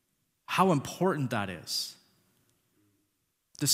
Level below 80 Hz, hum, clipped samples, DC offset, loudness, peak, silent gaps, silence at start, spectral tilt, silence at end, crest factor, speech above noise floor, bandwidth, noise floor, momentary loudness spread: -70 dBFS; none; under 0.1%; under 0.1%; -30 LUFS; -10 dBFS; none; 0.5 s; -4 dB/octave; 0 s; 24 dB; 49 dB; 16 kHz; -78 dBFS; 7 LU